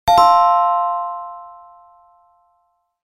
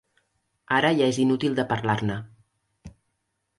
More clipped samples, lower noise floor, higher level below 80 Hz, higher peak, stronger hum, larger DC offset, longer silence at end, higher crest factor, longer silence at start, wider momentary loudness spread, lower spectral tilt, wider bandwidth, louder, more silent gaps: neither; second, -66 dBFS vs -77 dBFS; first, -48 dBFS vs -58 dBFS; first, 0 dBFS vs -8 dBFS; neither; neither; first, 1.55 s vs 0.7 s; about the same, 18 dB vs 20 dB; second, 0.05 s vs 0.7 s; first, 22 LU vs 7 LU; second, -3.5 dB/octave vs -5.5 dB/octave; first, 16 kHz vs 11.5 kHz; first, -15 LUFS vs -24 LUFS; neither